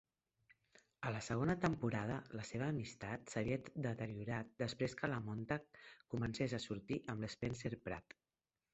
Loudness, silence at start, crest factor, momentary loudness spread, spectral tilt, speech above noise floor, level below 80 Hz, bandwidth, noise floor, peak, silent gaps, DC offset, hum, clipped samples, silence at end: -43 LUFS; 1 s; 20 dB; 8 LU; -6 dB/octave; over 48 dB; -66 dBFS; 8 kHz; under -90 dBFS; -22 dBFS; none; under 0.1%; none; under 0.1%; 0.75 s